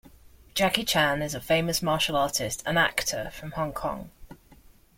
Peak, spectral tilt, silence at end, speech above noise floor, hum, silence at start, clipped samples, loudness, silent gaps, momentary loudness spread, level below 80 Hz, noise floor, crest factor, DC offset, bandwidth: -4 dBFS; -3 dB/octave; 0.45 s; 28 dB; none; 0.05 s; under 0.1%; -26 LUFS; none; 11 LU; -50 dBFS; -55 dBFS; 24 dB; under 0.1%; 16.5 kHz